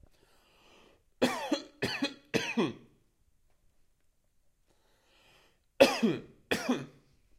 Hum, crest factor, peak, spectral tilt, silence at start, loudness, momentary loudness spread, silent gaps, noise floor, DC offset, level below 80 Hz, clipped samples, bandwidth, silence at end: none; 28 dB; -6 dBFS; -4 dB/octave; 1.2 s; -31 LUFS; 11 LU; none; -70 dBFS; under 0.1%; -68 dBFS; under 0.1%; 16 kHz; 0.5 s